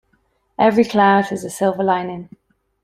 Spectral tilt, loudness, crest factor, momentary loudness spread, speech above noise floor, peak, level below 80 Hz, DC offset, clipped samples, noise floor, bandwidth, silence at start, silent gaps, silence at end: -5.5 dB/octave; -17 LUFS; 16 dB; 16 LU; 47 dB; -2 dBFS; -60 dBFS; under 0.1%; under 0.1%; -64 dBFS; 15.5 kHz; 0.6 s; none; 0.6 s